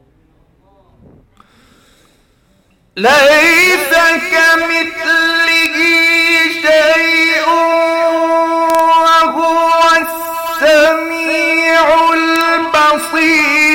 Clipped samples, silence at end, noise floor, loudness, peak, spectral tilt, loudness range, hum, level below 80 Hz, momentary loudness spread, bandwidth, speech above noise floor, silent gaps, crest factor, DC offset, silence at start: under 0.1%; 0 s; -53 dBFS; -9 LUFS; -2 dBFS; -1.5 dB/octave; 2 LU; none; -48 dBFS; 5 LU; 17 kHz; 43 dB; none; 10 dB; under 0.1%; 2.95 s